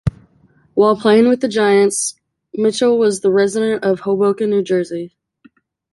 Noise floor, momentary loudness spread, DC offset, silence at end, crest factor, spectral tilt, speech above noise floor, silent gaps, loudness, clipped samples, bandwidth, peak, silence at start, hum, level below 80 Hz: -54 dBFS; 11 LU; under 0.1%; 0.85 s; 14 dB; -5 dB/octave; 39 dB; none; -15 LUFS; under 0.1%; 11.5 kHz; -2 dBFS; 0.05 s; none; -46 dBFS